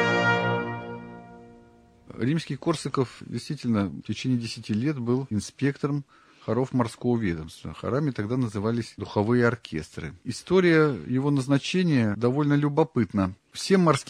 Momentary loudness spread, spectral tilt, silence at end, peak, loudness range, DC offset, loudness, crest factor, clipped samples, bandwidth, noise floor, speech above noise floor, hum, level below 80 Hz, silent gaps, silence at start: 13 LU; -6.5 dB/octave; 0.05 s; -6 dBFS; 6 LU; under 0.1%; -26 LUFS; 20 dB; under 0.1%; 13 kHz; -54 dBFS; 29 dB; none; -58 dBFS; none; 0 s